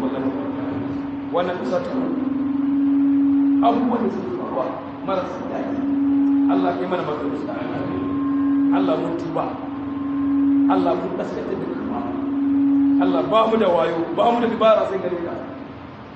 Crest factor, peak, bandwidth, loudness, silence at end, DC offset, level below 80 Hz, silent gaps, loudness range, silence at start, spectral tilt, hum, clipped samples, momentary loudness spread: 16 dB; -4 dBFS; 5.8 kHz; -21 LUFS; 0 s; under 0.1%; -54 dBFS; none; 4 LU; 0 s; -8 dB/octave; none; under 0.1%; 10 LU